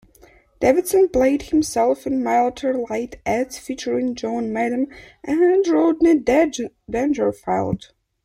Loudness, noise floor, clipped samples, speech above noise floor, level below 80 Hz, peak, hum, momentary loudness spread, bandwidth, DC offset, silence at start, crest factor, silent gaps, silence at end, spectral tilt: -20 LUFS; -52 dBFS; under 0.1%; 32 dB; -48 dBFS; -4 dBFS; none; 10 LU; 15.5 kHz; under 0.1%; 0.6 s; 16 dB; none; 0.5 s; -5.5 dB/octave